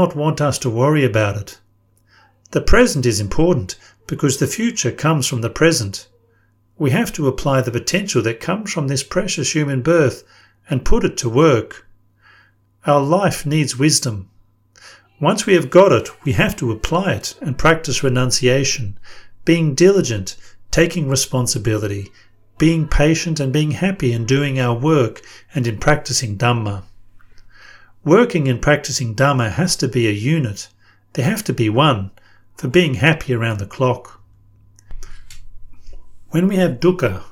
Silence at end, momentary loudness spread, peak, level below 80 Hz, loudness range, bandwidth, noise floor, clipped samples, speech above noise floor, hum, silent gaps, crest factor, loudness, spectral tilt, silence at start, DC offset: 0 s; 10 LU; 0 dBFS; -32 dBFS; 3 LU; 17 kHz; -57 dBFS; under 0.1%; 41 dB; none; none; 18 dB; -17 LUFS; -5 dB/octave; 0 s; under 0.1%